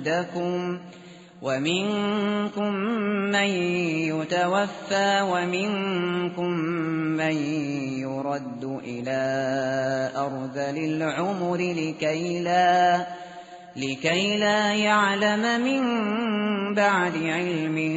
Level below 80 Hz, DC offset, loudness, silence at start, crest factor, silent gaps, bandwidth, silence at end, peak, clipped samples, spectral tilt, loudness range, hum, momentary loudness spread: -68 dBFS; under 0.1%; -25 LUFS; 0 s; 16 dB; none; 8 kHz; 0 s; -8 dBFS; under 0.1%; -3.5 dB/octave; 5 LU; none; 9 LU